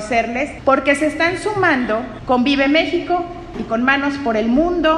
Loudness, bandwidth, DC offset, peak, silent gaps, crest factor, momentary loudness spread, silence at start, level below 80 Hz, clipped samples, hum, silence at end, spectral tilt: -17 LUFS; 11.5 kHz; under 0.1%; 0 dBFS; none; 16 dB; 7 LU; 0 s; -40 dBFS; under 0.1%; none; 0 s; -5 dB/octave